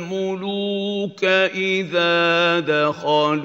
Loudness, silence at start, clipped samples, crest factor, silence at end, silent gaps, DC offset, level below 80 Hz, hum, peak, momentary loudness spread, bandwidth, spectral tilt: -19 LUFS; 0 s; under 0.1%; 16 dB; 0 s; none; under 0.1%; -74 dBFS; none; -4 dBFS; 8 LU; 8 kHz; -5 dB/octave